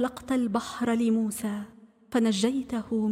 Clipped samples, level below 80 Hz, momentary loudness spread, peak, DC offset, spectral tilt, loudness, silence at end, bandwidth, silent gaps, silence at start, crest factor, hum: under 0.1%; -60 dBFS; 8 LU; -12 dBFS; under 0.1%; -5 dB/octave; -28 LUFS; 0 s; 15.5 kHz; none; 0 s; 14 dB; none